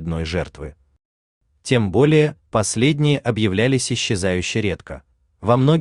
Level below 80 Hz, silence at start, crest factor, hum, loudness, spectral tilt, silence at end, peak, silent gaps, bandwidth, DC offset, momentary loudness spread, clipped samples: -46 dBFS; 0 s; 18 dB; none; -19 LUFS; -5.5 dB/octave; 0 s; -2 dBFS; 1.05-1.41 s; 11 kHz; under 0.1%; 17 LU; under 0.1%